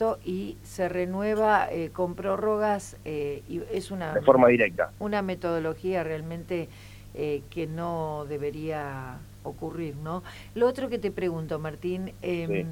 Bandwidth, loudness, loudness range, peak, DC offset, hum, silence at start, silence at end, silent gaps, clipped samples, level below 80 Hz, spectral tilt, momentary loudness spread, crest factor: 17 kHz; -28 LUFS; 8 LU; -4 dBFS; under 0.1%; 50 Hz at -50 dBFS; 0 s; 0 s; none; under 0.1%; -52 dBFS; -6.5 dB/octave; 13 LU; 24 dB